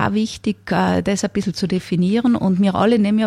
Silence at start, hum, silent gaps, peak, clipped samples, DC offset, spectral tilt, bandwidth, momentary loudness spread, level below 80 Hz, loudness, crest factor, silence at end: 0 s; none; none; -4 dBFS; under 0.1%; under 0.1%; -6 dB/octave; 12 kHz; 6 LU; -48 dBFS; -18 LUFS; 14 dB; 0 s